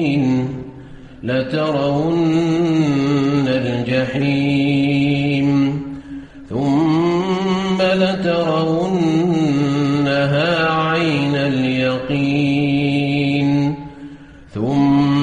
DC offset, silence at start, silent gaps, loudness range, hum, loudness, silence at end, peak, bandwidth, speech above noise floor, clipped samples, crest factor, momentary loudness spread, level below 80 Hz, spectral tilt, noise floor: 0.1%; 0 s; none; 2 LU; none; -17 LUFS; 0 s; -4 dBFS; 9.6 kHz; 21 dB; under 0.1%; 12 dB; 9 LU; -46 dBFS; -7 dB/octave; -37 dBFS